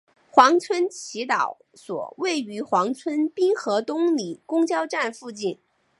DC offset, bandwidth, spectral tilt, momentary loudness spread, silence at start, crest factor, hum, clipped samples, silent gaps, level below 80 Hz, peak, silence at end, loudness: under 0.1%; 11.5 kHz; -3.5 dB/octave; 14 LU; 0.35 s; 22 dB; none; under 0.1%; none; -78 dBFS; 0 dBFS; 0.45 s; -23 LUFS